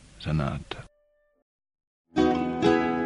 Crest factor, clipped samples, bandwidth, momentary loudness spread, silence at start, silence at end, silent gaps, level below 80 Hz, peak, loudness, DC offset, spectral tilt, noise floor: 20 dB; under 0.1%; 10.5 kHz; 15 LU; 0.2 s; 0 s; 1.42-1.59 s, 1.87-2.05 s; -46 dBFS; -8 dBFS; -26 LUFS; under 0.1%; -7 dB/octave; -68 dBFS